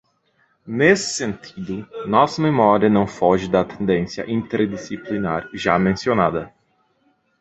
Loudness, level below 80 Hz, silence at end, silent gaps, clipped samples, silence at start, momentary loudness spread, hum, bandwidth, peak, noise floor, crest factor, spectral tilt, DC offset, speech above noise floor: -20 LUFS; -50 dBFS; 0.95 s; none; under 0.1%; 0.65 s; 14 LU; none; 8.2 kHz; -2 dBFS; -64 dBFS; 18 dB; -5.5 dB/octave; under 0.1%; 45 dB